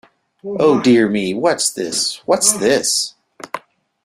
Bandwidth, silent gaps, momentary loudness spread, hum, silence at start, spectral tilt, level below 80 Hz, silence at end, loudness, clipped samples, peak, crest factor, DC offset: 16 kHz; none; 18 LU; none; 0.45 s; -3 dB/octave; -58 dBFS; 0.45 s; -15 LUFS; under 0.1%; 0 dBFS; 18 dB; under 0.1%